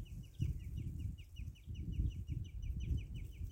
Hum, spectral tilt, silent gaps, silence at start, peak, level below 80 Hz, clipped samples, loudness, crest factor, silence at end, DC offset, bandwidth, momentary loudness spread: none; -7.5 dB/octave; none; 0 s; -26 dBFS; -46 dBFS; under 0.1%; -45 LUFS; 18 dB; 0 s; under 0.1%; 16.5 kHz; 8 LU